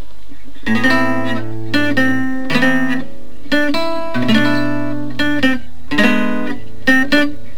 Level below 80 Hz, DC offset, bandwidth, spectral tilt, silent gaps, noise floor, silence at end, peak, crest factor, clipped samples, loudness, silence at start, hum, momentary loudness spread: -42 dBFS; 20%; over 20 kHz; -5 dB/octave; none; -40 dBFS; 0 s; 0 dBFS; 18 dB; under 0.1%; -16 LUFS; 0.3 s; none; 9 LU